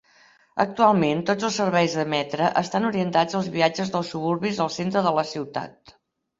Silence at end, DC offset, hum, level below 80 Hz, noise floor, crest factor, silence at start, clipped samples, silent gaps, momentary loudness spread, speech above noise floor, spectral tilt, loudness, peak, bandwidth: 0.7 s; under 0.1%; none; -64 dBFS; -57 dBFS; 20 dB; 0.55 s; under 0.1%; none; 8 LU; 34 dB; -5.5 dB/octave; -23 LUFS; -4 dBFS; 7.8 kHz